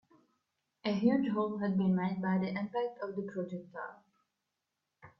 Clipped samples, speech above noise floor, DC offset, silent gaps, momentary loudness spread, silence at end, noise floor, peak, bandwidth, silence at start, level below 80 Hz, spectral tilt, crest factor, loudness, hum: under 0.1%; 54 dB; under 0.1%; none; 13 LU; 0.1 s; -87 dBFS; -16 dBFS; 6 kHz; 0.85 s; -76 dBFS; -9 dB/octave; 20 dB; -34 LUFS; none